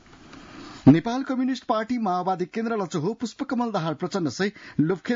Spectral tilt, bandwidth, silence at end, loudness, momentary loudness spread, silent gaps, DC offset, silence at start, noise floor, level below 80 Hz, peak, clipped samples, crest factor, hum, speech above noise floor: -6.5 dB/octave; 7.6 kHz; 0 s; -25 LUFS; 10 LU; none; under 0.1%; 0.3 s; -47 dBFS; -60 dBFS; -6 dBFS; under 0.1%; 20 dB; none; 23 dB